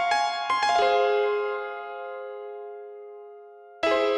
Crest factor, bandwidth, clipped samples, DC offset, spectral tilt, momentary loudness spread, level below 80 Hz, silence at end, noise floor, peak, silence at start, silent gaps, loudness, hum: 16 dB; 11 kHz; under 0.1%; under 0.1%; -1.5 dB/octave; 21 LU; -66 dBFS; 0 s; -47 dBFS; -10 dBFS; 0 s; none; -25 LUFS; none